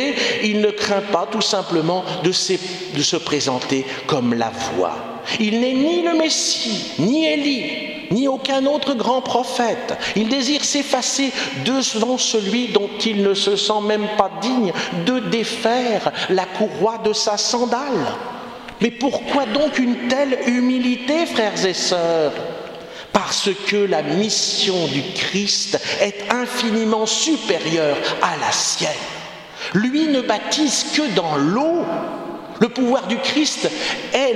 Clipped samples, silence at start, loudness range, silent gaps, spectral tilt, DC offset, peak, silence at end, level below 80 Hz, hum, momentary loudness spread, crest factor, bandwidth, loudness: under 0.1%; 0 s; 2 LU; none; -3 dB/octave; under 0.1%; 0 dBFS; 0 s; -60 dBFS; none; 5 LU; 20 dB; 14 kHz; -19 LUFS